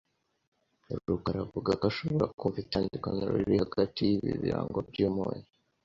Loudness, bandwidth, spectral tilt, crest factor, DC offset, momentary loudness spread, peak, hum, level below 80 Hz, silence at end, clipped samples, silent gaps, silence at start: -31 LUFS; 7.6 kHz; -8 dB/octave; 20 dB; under 0.1%; 6 LU; -12 dBFS; none; -54 dBFS; 0.45 s; under 0.1%; 2.34-2.38 s; 0.9 s